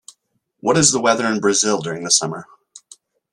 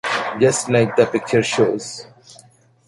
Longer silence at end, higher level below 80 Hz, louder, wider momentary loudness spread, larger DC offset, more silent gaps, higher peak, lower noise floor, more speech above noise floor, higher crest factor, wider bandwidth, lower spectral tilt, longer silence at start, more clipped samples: first, 0.9 s vs 0.55 s; about the same, -56 dBFS vs -56 dBFS; about the same, -17 LUFS vs -18 LUFS; about the same, 11 LU vs 12 LU; neither; neither; about the same, 0 dBFS vs -2 dBFS; first, -67 dBFS vs -51 dBFS; first, 50 dB vs 33 dB; about the same, 20 dB vs 18 dB; first, 13 kHz vs 11.5 kHz; second, -2.5 dB/octave vs -4.5 dB/octave; first, 0.65 s vs 0.05 s; neither